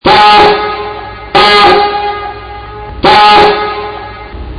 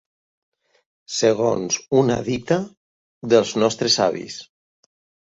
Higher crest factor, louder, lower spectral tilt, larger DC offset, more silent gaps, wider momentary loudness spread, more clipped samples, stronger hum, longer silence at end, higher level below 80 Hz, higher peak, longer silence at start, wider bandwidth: second, 8 dB vs 20 dB; first, -6 LUFS vs -20 LUFS; about the same, -4.5 dB/octave vs -4 dB/octave; neither; second, none vs 2.77-3.21 s; first, 21 LU vs 16 LU; first, 3% vs under 0.1%; neither; second, 0 s vs 0.9 s; first, -30 dBFS vs -56 dBFS; about the same, 0 dBFS vs -2 dBFS; second, 0.05 s vs 1.1 s; first, 11 kHz vs 8 kHz